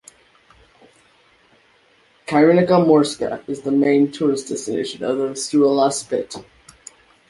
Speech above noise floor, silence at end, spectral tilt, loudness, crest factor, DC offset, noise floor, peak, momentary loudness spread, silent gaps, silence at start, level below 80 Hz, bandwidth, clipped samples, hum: 39 dB; 0.85 s; -5.5 dB/octave; -18 LUFS; 18 dB; under 0.1%; -56 dBFS; -2 dBFS; 12 LU; none; 2.3 s; -62 dBFS; 11.5 kHz; under 0.1%; none